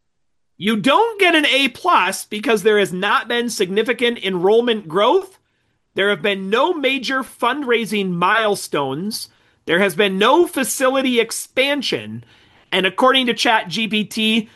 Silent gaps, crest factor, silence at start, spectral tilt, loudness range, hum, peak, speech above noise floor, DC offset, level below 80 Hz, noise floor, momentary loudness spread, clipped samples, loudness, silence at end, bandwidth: none; 16 dB; 0.6 s; -3.5 dB/octave; 3 LU; none; -2 dBFS; 58 dB; under 0.1%; -66 dBFS; -75 dBFS; 8 LU; under 0.1%; -17 LUFS; 0.1 s; 13 kHz